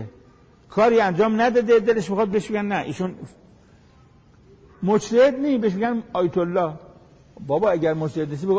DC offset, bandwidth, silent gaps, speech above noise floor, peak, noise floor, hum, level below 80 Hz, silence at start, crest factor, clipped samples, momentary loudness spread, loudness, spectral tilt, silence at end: under 0.1%; 8 kHz; none; 32 dB; -8 dBFS; -52 dBFS; none; -56 dBFS; 0 s; 14 dB; under 0.1%; 11 LU; -21 LUFS; -6.5 dB/octave; 0 s